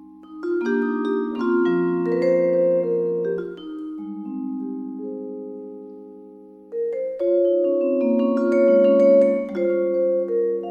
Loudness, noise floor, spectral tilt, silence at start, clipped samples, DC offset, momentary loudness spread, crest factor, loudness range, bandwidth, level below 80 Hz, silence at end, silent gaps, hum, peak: -21 LUFS; -44 dBFS; -8.5 dB/octave; 0 s; under 0.1%; under 0.1%; 17 LU; 14 dB; 13 LU; 5.8 kHz; -66 dBFS; 0 s; none; none; -6 dBFS